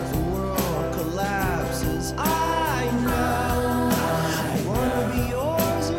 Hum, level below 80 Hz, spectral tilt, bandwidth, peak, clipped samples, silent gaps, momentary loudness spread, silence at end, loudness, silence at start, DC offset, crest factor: none; -36 dBFS; -5.5 dB/octave; 18 kHz; -10 dBFS; under 0.1%; none; 4 LU; 0 s; -24 LUFS; 0 s; under 0.1%; 14 dB